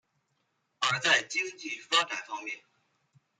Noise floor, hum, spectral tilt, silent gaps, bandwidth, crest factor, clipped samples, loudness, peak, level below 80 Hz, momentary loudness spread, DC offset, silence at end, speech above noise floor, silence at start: -77 dBFS; none; -1 dB/octave; none; 13 kHz; 24 dB; under 0.1%; -28 LUFS; -10 dBFS; -88 dBFS; 14 LU; under 0.1%; 0.8 s; 46 dB; 0.8 s